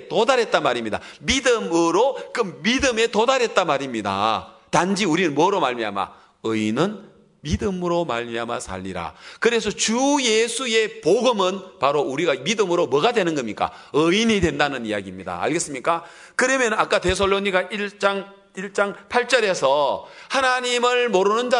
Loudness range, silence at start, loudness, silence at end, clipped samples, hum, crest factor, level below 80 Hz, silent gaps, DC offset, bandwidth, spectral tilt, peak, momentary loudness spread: 3 LU; 0 s; -21 LUFS; 0 s; under 0.1%; none; 20 dB; -48 dBFS; none; under 0.1%; 11 kHz; -3.5 dB/octave; -2 dBFS; 10 LU